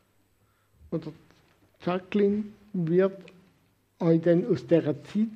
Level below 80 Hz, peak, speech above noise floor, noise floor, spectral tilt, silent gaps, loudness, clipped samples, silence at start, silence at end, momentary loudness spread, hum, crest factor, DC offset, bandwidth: -68 dBFS; -8 dBFS; 42 dB; -67 dBFS; -9 dB/octave; none; -27 LUFS; under 0.1%; 0.9 s; 0 s; 12 LU; none; 20 dB; under 0.1%; 7.6 kHz